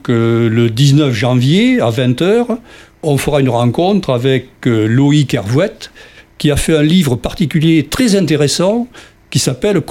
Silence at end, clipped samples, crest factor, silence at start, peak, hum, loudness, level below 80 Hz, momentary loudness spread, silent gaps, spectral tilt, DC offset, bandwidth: 0.05 s; under 0.1%; 12 dB; 0.05 s; 0 dBFS; none; -13 LUFS; -36 dBFS; 7 LU; none; -6 dB/octave; under 0.1%; 16.5 kHz